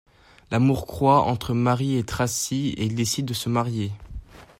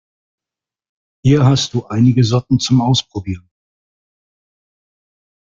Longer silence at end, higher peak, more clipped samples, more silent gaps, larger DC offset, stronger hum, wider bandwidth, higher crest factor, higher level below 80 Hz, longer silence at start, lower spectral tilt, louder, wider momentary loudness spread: second, 0.15 s vs 2.2 s; second, -6 dBFS vs -2 dBFS; neither; neither; neither; neither; first, 16 kHz vs 7.6 kHz; about the same, 18 dB vs 16 dB; about the same, -46 dBFS vs -48 dBFS; second, 0.5 s vs 1.25 s; about the same, -5.5 dB/octave vs -6 dB/octave; second, -23 LUFS vs -14 LUFS; second, 10 LU vs 13 LU